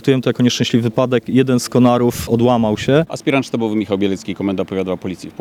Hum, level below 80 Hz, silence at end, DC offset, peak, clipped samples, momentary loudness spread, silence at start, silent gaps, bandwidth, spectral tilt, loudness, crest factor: none; -46 dBFS; 0.1 s; under 0.1%; -2 dBFS; under 0.1%; 8 LU; 0.05 s; none; 16 kHz; -6 dB/octave; -16 LUFS; 14 dB